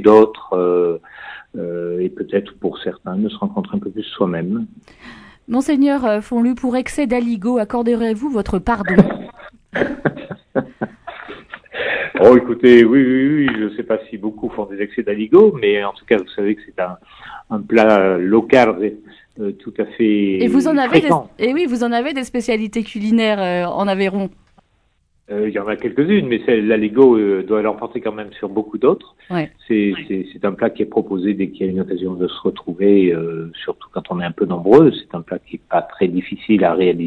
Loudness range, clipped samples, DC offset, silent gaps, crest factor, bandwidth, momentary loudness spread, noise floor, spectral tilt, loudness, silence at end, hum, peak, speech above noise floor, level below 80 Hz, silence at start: 7 LU; 0.1%; under 0.1%; none; 16 dB; 11 kHz; 15 LU; -61 dBFS; -7 dB/octave; -17 LUFS; 0 s; none; 0 dBFS; 45 dB; -46 dBFS; 0 s